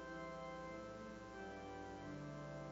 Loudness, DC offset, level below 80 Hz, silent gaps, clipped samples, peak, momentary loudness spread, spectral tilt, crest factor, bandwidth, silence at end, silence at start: -51 LUFS; under 0.1%; -68 dBFS; none; under 0.1%; -38 dBFS; 2 LU; -6 dB/octave; 12 dB; 16 kHz; 0 s; 0 s